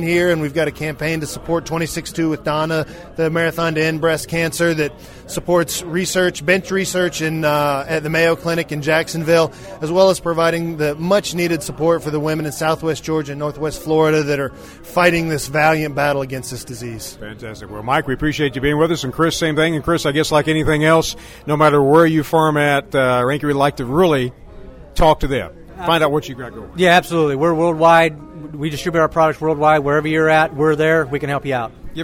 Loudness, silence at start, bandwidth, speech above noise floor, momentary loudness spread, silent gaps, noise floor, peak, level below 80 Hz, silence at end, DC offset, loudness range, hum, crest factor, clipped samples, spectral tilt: -17 LUFS; 0 s; 16.5 kHz; 20 dB; 11 LU; none; -36 dBFS; 0 dBFS; -38 dBFS; 0 s; under 0.1%; 5 LU; none; 16 dB; under 0.1%; -5 dB/octave